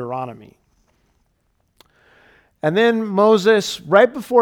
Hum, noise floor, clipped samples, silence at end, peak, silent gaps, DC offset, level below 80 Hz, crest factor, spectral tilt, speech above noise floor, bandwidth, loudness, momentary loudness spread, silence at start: none; -65 dBFS; under 0.1%; 0 s; 0 dBFS; none; under 0.1%; -62 dBFS; 18 dB; -5 dB/octave; 49 dB; 16.5 kHz; -16 LUFS; 13 LU; 0 s